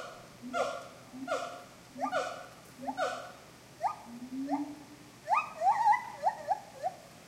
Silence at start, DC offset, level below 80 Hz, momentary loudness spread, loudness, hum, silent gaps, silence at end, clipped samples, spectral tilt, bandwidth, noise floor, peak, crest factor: 0 s; under 0.1%; -72 dBFS; 20 LU; -34 LUFS; none; none; 0 s; under 0.1%; -3.5 dB/octave; 16 kHz; -53 dBFS; -16 dBFS; 18 dB